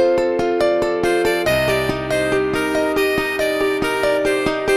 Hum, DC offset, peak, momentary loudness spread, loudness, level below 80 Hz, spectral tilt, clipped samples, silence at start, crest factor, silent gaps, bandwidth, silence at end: none; under 0.1%; -6 dBFS; 2 LU; -18 LUFS; -42 dBFS; -4.5 dB/octave; under 0.1%; 0 s; 12 dB; none; 16 kHz; 0 s